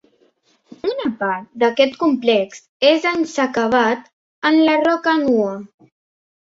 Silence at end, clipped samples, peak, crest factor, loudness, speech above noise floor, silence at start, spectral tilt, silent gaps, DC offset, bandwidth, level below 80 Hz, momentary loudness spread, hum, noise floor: 0.85 s; under 0.1%; -2 dBFS; 16 dB; -17 LUFS; 42 dB; 0.85 s; -4.5 dB/octave; 2.69-2.80 s, 4.13-4.42 s; under 0.1%; 7.8 kHz; -62 dBFS; 9 LU; none; -59 dBFS